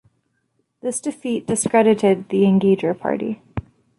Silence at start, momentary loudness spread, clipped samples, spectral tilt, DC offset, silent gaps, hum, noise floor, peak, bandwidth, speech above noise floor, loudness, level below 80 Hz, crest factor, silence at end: 0.85 s; 14 LU; under 0.1%; -6 dB/octave; under 0.1%; none; none; -69 dBFS; -4 dBFS; 11.5 kHz; 51 dB; -19 LUFS; -50 dBFS; 16 dB; 0.4 s